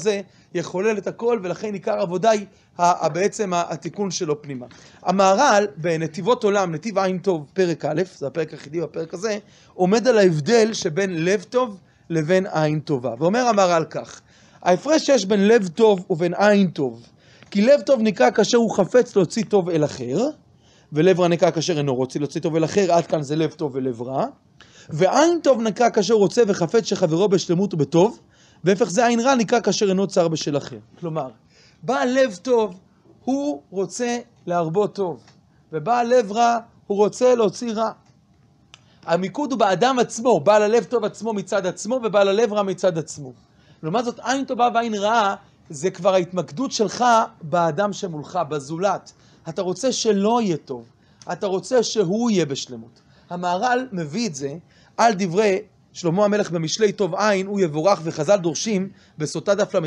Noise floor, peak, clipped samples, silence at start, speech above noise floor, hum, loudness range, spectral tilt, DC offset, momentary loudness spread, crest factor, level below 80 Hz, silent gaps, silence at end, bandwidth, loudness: -56 dBFS; -4 dBFS; under 0.1%; 0 s; 36 dB; none; 5 LU; -5 dB/octave; under 0.1%; 11 LU; 18 dB; -66 dBFS; none; 0 s; 10.5 kHz; -21 LUFS